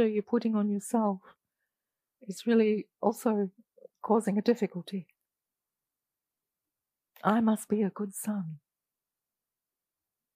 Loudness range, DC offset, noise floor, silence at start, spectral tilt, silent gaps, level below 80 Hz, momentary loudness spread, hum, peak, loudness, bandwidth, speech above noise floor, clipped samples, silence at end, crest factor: 4 LU; under 0.1%; under -90 dBFS; 0 s; -6.5 dB/octave; none; -82 dBFS; 14 LU; none; -12 dBFS; -30 LUFS; 15.5 kHz; over 61 dB; under 0.1%; 1.8 s; 20 dB